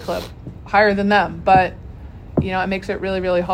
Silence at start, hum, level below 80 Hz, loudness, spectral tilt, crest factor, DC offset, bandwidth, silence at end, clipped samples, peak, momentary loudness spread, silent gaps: 0 s; none; -38 dBFS; -18 LUFS; -6.5 dB/octave; 18 dB; under 0.1%; 16 kHz; 0 s; under 0.1%; 0 dBFS; 21 LU; none